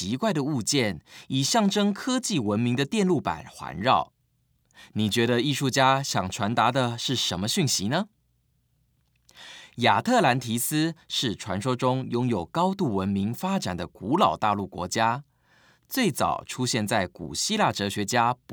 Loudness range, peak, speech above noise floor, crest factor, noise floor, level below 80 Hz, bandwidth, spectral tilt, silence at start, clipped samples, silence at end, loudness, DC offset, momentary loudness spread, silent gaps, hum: 3 LU; -6 dBFS; 44 dB; 20 dB; -69 dBFS; -62 dBFS; over 20 kHz; -4 dB/octave; 0 s; under 0.1%; 0 s; -25 LUFS; under 0.1%; 8 LU; none; none